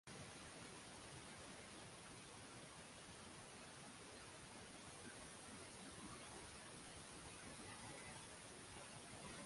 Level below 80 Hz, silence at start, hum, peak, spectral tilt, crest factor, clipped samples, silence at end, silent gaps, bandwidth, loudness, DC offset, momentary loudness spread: -74 dBFS; 0.05 s; none; -42 dBFS; -3 dB/octave; 16 dB; under 0.1%; 0 s; none; 11.5 kHz; -56 LUFS; under 0.1%; 2 LU